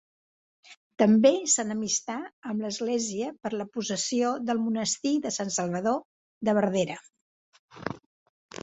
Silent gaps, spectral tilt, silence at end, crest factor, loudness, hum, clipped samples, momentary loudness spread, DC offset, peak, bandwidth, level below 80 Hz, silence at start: 0.77-0.90 s, 2.33-2.42 s, 6.05-6.41 s, 7.21-7.52 s, 7.59-7.68 s; -4 dB/octave; 0.65 s; 22 dB; -27 LUFS; none; under 0.1%; 15 LU; under 0.1%; -6 dBFS; 8.4 kHz; -70 dBFS; 0.7 s